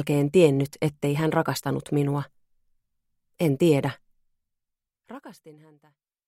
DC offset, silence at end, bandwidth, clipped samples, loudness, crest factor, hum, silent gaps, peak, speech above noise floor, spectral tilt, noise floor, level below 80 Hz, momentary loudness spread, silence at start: under 0.1%; 0.75 s; 16 kHz; under 0.1%; -24 LUFS; 20 dB; none; none; -6 dBFS; 60 dB; -7 dB/octave; -84 dBFS; -62 dBFS; 23 LU; 0 s